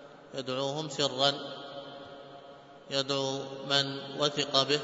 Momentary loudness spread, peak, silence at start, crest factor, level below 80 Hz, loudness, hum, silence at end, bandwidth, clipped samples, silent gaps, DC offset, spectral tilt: 20 LU; -8 dBFS; 0 s; 24 dB; -76 dBFS; -30 LUFS; none; 0 s; 8 kHz; under 0.1%; none; under 0.1%; -3.5 dB/octave